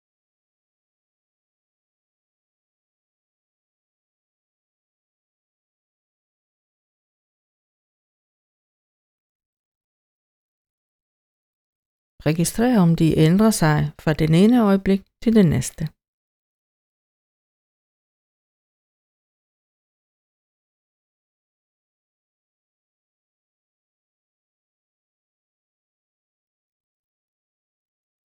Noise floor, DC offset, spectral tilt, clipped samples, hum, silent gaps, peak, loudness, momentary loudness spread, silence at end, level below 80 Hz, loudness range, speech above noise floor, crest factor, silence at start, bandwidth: under -90 dBFS; under 0.1%; -6.5 dB/octave; under 0.1%; none; none; -4 dBFS; -18 LUFS; 9 LU; 12.45 s; -50 dBFS; 10 LU; over 73 dB; 22 dB; 12.25 s; 19 kHz